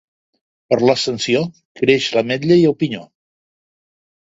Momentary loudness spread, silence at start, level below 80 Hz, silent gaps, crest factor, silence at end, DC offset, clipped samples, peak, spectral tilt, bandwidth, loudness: 9 LU; 0.7 s; -58 dBFS; 1.65-1.75 s; 18 dB; 1.2 s; under 0.1%; under 0.1%; 0 dBFS; -5.5 dB/octave; 8 kHz; -16 LUFS